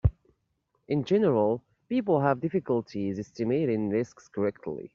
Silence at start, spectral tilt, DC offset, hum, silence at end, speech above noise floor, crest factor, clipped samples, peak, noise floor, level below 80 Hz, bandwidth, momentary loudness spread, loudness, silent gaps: 0.05 s; -8 dB/octave; under 0.1%; none; 0.05 s; 48 dB; 18 dB; under 0.1%; -10 dBFS; -75 dBFS; -46 dBFS; 7.4 kHz; 9 LU; -28 LUFS; none